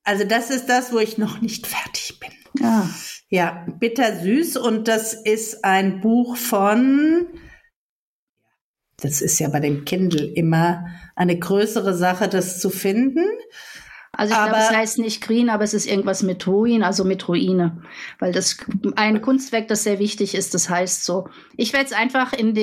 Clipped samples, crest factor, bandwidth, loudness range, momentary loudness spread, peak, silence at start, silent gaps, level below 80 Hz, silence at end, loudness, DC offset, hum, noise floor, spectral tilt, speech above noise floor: under 0.1%; 16 dB; 16.5 kHz; 3 LU; 9 LU; -4 dBFS; 0.05 s; 7.76-8.36 s, 8.61-8.74 s; -60 dBFS; 0 s; -20 LUFS; under 0.1%; none; -73 dBFS; -4.5 dB/octave; 54 dB